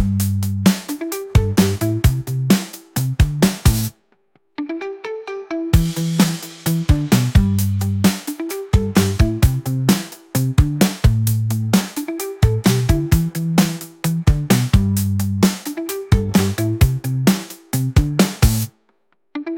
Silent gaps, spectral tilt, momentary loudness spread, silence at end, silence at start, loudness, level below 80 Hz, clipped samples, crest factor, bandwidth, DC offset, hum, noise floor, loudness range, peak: none; -5.5 dB/octave; 10 LU; 0 s; 0 s; -18 LUFS; -26 dBFS; under 0.1%; 16 dB; 17 kHz; under 0.1%; none; -64 dBFS; 3 LU; 0 dBFS